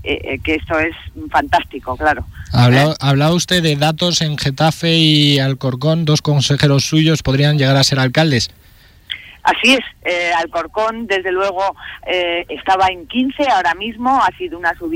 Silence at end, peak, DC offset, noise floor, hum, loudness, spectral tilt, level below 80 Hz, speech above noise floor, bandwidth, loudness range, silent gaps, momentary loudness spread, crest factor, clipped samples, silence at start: 0 s; -2 dBFS; under 0.1%; -42 dBFS; none; -15 LUFS; -5 dB/octave; -40 dBFS; 27 dB; 16.5 kHz; 4 LU; none; 8 LU; 12 dB; under 0.1%; 0 s